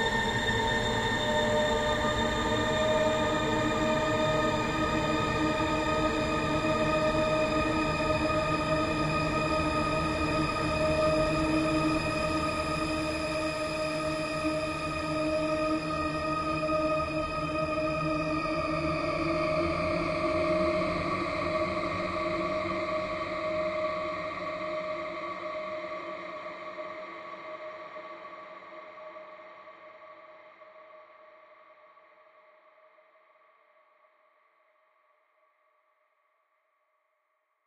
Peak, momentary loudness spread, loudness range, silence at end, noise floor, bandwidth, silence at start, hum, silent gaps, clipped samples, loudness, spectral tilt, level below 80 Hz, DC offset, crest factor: -14 dBFS; 14 LU; 14 LU; 5.95 s; -77 dBFS; 15.5 kHz; 0 s; none; none; under 0.1%; -29 LUFS; -5 dB/octave; -46 dBFS; under 0.1%; 16 dB